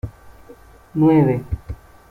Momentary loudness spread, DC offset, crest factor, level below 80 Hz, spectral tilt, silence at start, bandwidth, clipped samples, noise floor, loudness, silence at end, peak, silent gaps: 22 LU; under 0.1%; 16 dB; -38 dBFS; -10.5 dB/octave; 0.05 s; 4.4 kHz; under 0.1%; -45 dBFS; -18 LUFS; 0.35 s; -4 dBFS; none